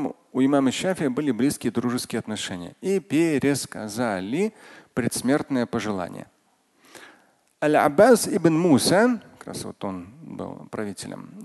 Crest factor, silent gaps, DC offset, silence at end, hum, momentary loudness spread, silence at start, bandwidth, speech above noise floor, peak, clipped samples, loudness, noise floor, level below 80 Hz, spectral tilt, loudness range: 20 dB; none; under 0.1%; 0 s; none; 17 LU; 0 s; 12.5 kHz; 41 dB; -4 dBFS; under 0.1%; -23 LUFS; -64 dBFS; -60 dBFS; -5 dB/octave; 6 LU